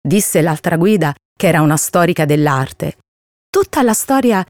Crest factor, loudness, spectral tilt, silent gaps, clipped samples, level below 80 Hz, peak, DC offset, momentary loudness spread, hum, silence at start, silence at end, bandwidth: 12 dB; -14 LUFS; -5 dB/octave; 1.25-1.36 s, 3.08-3.53 s; under 0.1%; -50 dBFS; -2 dBFS; under 0.1%; 7 LU; none; 0.05 s; 0.05 s; 19.5 kHz